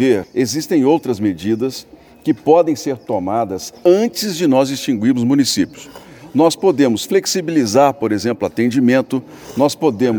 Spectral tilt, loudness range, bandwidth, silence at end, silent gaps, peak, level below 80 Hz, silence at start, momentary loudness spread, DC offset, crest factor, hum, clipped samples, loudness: -5 dB/octave; 2 LU; over 20 kHz; 0 s; none; 0 dBFS; -56 dBFS; 0 s; 9 LU; under 0.1%; 16 dB; none; under 0.1%; -16 LUFS